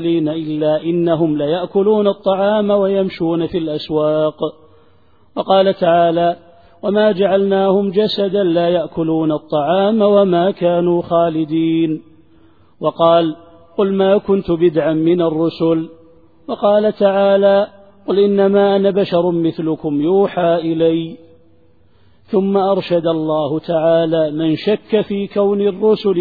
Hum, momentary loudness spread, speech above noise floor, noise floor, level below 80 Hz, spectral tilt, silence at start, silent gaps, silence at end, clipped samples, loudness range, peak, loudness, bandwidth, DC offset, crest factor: none; 7 LU; 39 dB; -53 dBFS; -54 dBFS; -10 dB/octave; 0 s; none; 0 s; under 0.1%; 3 LU; 0 dBFS; -15 LUFS; 4.9 kHz; 0.3%; 16 dB